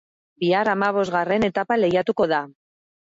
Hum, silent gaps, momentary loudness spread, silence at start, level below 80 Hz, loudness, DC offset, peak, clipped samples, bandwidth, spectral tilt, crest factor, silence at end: none; none; 5 LU; 0.4 s; -58 dBFS; -21 LUFS; under 0.1%; -8 dBFS; under 0.1%; 7.8 kHz; -6.5 dB/octave; 14 dB; 0.55 s